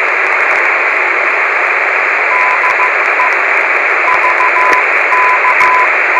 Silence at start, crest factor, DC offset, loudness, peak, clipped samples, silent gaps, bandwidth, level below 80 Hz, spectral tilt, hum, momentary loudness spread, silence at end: 0 s; 10 dB; under 0.1%; -9 LUFS; 0 dBFS; under 0.1%; none; 15 kHz; -60 dBFS; -1.5 dB/octave; none; 2 LU; 0 s